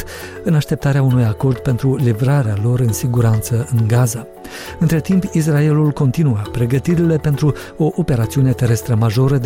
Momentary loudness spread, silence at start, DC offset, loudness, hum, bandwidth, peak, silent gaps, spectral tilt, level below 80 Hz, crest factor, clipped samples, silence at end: 5 LU; 0 s; under 0.1%; -16 LUFS; none; 16.5 kHz; -4 dBFS; none; -7 dB/octave; -38 dBFS; 10 dB; under 0.1%; 0 s